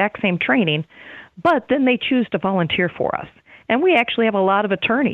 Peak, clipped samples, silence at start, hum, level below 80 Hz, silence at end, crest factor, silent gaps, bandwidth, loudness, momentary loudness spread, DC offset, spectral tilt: -4 dBFS; under 0.1%; 0 s; none; -56 dBFS; 0 s; 16 dB; none; 5.2 kHz; -19 LUFS; 10 LU; under 0.1%; -8 dB/octave